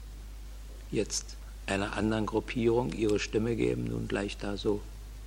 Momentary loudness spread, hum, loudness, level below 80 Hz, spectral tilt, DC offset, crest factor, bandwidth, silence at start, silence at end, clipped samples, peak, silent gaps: 18 LU; none; -31 LUFS; -44 dBFS; -5 dB/octave; under 0.1%; 16 dB; 16.5 kHz; 0 s; 0 s; under 0.1%; -16 dBFS; none